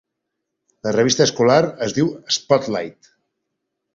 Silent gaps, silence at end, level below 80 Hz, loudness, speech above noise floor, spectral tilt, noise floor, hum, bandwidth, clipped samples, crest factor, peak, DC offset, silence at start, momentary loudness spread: none; 1.05 s; -58 dBFS; -18 LUFS; 61 dB; -4 dB/octave; -79 dBFS; none; 7.8 kHz; under 0.1%; 20 dB; -2 dBFS; under 0.1%; 0.85 s; 11 LU